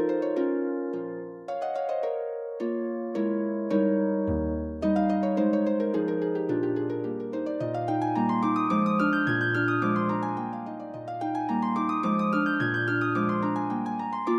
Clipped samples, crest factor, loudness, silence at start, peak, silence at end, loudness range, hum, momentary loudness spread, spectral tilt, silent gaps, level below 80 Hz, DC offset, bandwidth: under 0.1%; 14 dB; -27 LUFS; 0 s; -12 dBFS; 0 s; 3 LU; none; 8 LU; -8.5 dB/octave; none; -52 dBFS; under 0.1%; 8 kHz